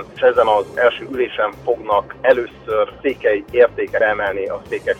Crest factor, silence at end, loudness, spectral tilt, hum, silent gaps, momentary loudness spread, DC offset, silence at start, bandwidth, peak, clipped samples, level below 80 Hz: 16 dB; 0 s; -18 LUFS; -5.5 dB/octave; none; none; 7 LU; under 0.1%; 0 s; 8.8 kHz; -2 dBFS; under 0.1%; -48 dBFS